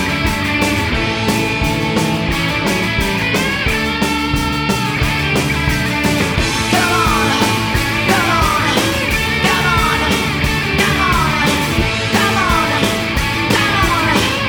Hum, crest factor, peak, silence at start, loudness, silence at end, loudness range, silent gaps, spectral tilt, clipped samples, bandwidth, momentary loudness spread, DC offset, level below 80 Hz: none; 14 dB; 0 dBFS; 0 s; -14 LUFS; 0 s; 2 LU; none; -4 dB/octave; under 0.1%; over 20 kHz; 3 LU; under 0.1%; -28 dBFS